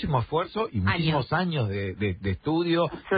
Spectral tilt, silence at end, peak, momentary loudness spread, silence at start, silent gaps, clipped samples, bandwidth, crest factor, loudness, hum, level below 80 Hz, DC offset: -11 dB/octave; 0 s; -12 dBFS; 5 LU; 0 s; none; under 0.1%; 5 kHz; 14 dB; -27 LUFS; none; -44 dBFS; under 0.1%